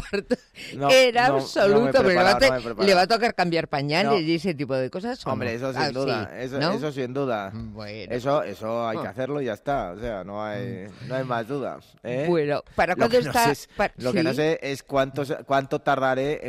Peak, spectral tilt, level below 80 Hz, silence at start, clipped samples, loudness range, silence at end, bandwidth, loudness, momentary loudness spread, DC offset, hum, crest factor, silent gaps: -10 dBFS; -5 dB/octave; -52 dBFS; 0 s; under 0.1%; 9 LU; 0 s; 16 kHz; -23 LUFS; 13 LU; under 0.1%; none; 14 dB; none